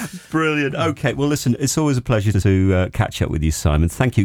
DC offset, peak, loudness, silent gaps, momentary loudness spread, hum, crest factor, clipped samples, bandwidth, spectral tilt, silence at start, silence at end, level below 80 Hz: under 0.1%; -2 dBFS; -19 LUFS; none; 4 LU; none; 16 dB; under 0.1%; 17.5 kHz; -6 dB/octave; 0 s; 0 s; -30 dBFS